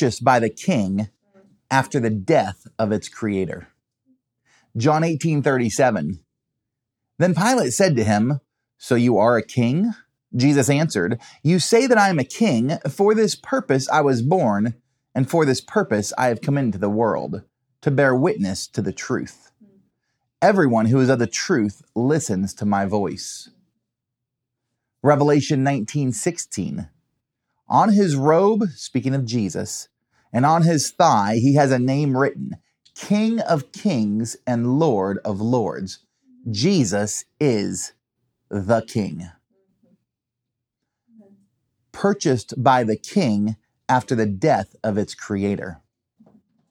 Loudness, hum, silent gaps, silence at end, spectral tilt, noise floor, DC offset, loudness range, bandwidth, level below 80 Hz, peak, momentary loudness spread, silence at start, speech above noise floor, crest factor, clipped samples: -20 LUFS; none; none; 0.95 s; -5.5 dB/octave; -83 dBFS; under 0.1%; 5 LU; 16 kHz; -64 dBFS; -2 dBFS; 12 LU; 0 s; 63 dB; 20 dB; under 0.1%